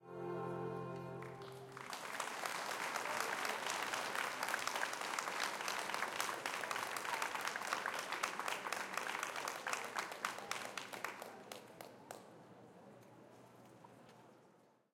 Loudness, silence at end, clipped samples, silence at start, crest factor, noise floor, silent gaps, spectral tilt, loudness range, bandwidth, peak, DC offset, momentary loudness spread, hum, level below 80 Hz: -42 LUFS; 0.35 s; under 0.1%; 0 s; 26 dB; -69 dBFS; none; -2 dB/octave; 12 LU; 17 kHz; -18 dBFS; under 0.1%; 20 LU; none; -88 dBFS